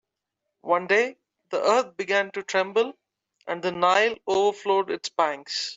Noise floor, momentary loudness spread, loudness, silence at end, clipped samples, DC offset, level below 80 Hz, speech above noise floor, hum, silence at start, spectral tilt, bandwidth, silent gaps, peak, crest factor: -83 dBFS; 9 LU; -24 LUFS; 0 s; under 0.1%; under 0.1%; -72 dBFS; 59 dB; none; 0.65 s; -3 dB/octave; 8 kHz; none; -6 dBFS; 18 dB